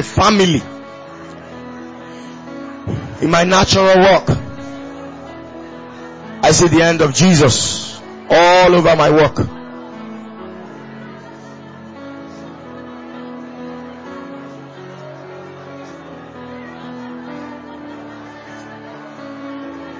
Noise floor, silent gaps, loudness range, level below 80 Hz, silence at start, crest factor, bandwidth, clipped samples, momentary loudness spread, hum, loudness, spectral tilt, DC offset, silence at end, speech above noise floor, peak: -35 dBFS; none; 21 LU; -40 dBFS; 0 s; 18 dB; 8 kHz; under 0.1%; 24 LU; none; -12 LUFS; -4.5 dB/octave; under 0.1%; 0 s; 24 dB; 0 dBFS